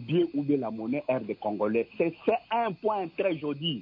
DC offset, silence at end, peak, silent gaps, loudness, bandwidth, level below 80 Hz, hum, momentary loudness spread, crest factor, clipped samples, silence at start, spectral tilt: under 0.1%; 0 s; -14 dBFS; none; -29 LUFS; 5.2 kHz; -70 dBFS; none; 4 LU; 16 dB; under 0.1%; 0 s; -9.5 dB/octave